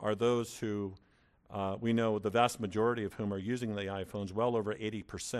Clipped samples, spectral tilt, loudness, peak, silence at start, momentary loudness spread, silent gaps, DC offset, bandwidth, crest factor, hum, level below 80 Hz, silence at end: under 0.1%; -5.5 dB/octave; -34 LUFS; -14 dBFS; 0 s; 9 LU; none; under 0.1%; 14.5 kHz; 20 dB; none; -66 dBFS; 0 s